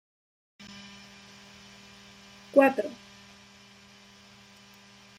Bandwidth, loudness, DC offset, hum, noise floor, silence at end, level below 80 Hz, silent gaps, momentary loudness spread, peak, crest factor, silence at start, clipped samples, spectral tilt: 15.5 kHz; -25 LUFS; under 0.1%; none; -54 dBFS; 2.25 s; -74 dBFS; none; 29 LU; -8 dBFS; 26 dB; 2.55 s; under 0.1%; -4.5 dB/octave